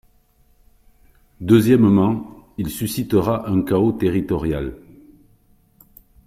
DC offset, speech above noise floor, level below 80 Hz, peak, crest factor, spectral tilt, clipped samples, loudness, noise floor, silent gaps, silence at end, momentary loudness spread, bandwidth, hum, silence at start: under 0.1%; 40 dB; -44 dBFS; -2 dBFS; 18 dB; -7.5 dB/octave; under 0.1%; -19 LUFS; -57 dBFS; none; 1.5 s; 15 LU; 16 kHz; none; 1.4 s